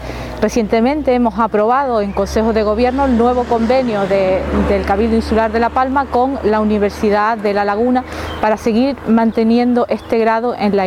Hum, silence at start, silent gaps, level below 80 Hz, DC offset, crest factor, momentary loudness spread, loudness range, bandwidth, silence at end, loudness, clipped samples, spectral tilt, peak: none; 0 s; none; -32 dBFS; under 0.1%; 14 dB; 3 LU; 1 LU; 13 kHz; 0 s; -15 LUFS; under 0.1%; -6.5 dB/octave; 0 dBFS